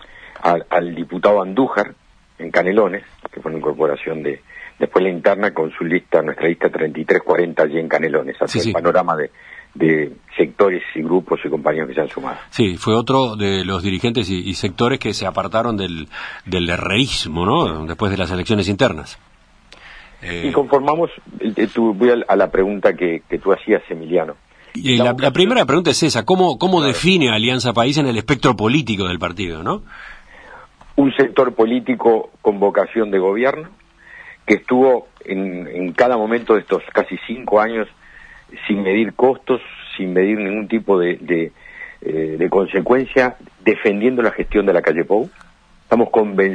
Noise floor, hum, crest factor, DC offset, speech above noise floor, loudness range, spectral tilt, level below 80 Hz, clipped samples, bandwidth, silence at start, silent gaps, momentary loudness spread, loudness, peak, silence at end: -47 dBFS; none; 18 dB; under 0.1%; 30 dB; 4 LU; -5.5 dB/octave; -44 dBFS; under 0.1%; 10.5 kHz; 0 s; none; 10 LU; -17 LUFS; 0 dBFS; 0 s